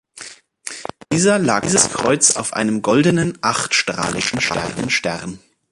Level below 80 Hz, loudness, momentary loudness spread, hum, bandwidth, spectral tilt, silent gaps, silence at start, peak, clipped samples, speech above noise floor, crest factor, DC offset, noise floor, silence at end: -50 dBFS; -17 LUFS; 17 LU; none; 11.5 kHz; -3 dB/octave; none; 0.15 s; 0 dBFS; under 0.1%; 21 dB; 18 dB; under 0.1%; -39 dBFS; 0.35 s